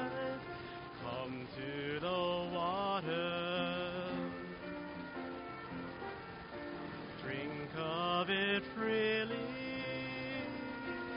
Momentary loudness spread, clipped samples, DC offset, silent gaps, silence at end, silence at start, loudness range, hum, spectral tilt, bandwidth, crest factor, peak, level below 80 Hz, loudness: 12 LU; under 0.1%; under 0.1%; none; 0 s; 0 s; 8 LU; none; -3 dB/octave; 5.2 kHz; 18 dB; -22 dBFS; -66 dBFS; -39 LUFS